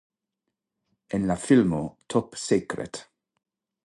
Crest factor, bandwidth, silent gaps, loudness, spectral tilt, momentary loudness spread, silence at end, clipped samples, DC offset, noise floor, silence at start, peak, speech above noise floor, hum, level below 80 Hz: 20 dB; 11.5 kHz; none; -25 LUFS; -6 dB/octave; 13 LU; 0.85 s; under 0.1%; under 0.1%; -84 dBFS; 1.1 s; -8 dBFS; 59 dB; none; -56 dBFS